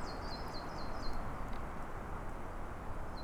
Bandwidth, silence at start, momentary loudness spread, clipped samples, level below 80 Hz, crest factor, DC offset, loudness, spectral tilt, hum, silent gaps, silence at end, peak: 13.5 kHz; 0 s; 3 LU; under 0.1%; -44 dBFS; 14 dB; under 0.1%; -45 LUFS; -5.5 dB/octave; none; none; 0 s; -26 dBFS